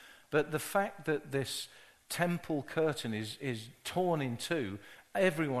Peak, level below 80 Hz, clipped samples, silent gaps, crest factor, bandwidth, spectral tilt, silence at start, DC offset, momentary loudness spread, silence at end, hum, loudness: -14 dBFS; -68 dBFS; under 0.1%; none; 20 dB; 13 kHz; -5 dB/octave; 0 s; under 0.1%; 9 LU; 0 s; none; -35 LUFS